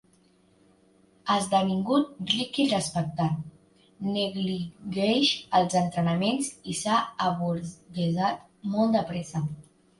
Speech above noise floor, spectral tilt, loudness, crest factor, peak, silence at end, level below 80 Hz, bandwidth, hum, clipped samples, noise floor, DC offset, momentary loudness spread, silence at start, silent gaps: 36 dB; -5 dB/octave; -27 LUFS; 18 dB; -10 dBFS; 0.4 s; -62 dBFS; 11.5 kHz; none; under 0.1%; -62 dBFS; under 0.1%; 10 LU; 1.25 s; none